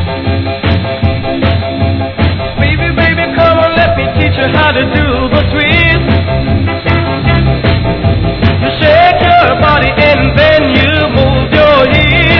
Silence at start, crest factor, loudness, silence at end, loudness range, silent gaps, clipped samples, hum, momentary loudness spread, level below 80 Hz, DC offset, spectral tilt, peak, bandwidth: 0 s; 8 dB; -9 LUFS; 0 s; 3 LU; none; 1%; none; 6 LU; -22 dBFS; under 0.1%; -8.5 dB/octave; 0 dBFS; 5.4 kHz